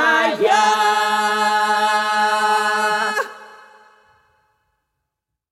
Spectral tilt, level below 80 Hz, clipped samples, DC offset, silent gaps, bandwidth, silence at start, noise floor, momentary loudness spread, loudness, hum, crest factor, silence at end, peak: -1.5 dB/octave; -76 dBFS; under 0.1%; under 0.1%; none; 15 kHz; 0 s; -80 dBFS; 4 LU; -17 LUFS; none; 16 dB; 1.95 s; -4 dBFS